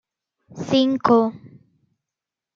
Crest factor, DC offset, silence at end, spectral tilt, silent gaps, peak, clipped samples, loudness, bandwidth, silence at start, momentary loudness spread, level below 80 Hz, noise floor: 20 dB; under 0.1%; 1.1 s; -6 dB/octave; none; -4 dBFS; under 0.1%; -19 LUFS; 7.4 kHz; 0.5 s; 10 LU; -66 dBFS; -87 dBFS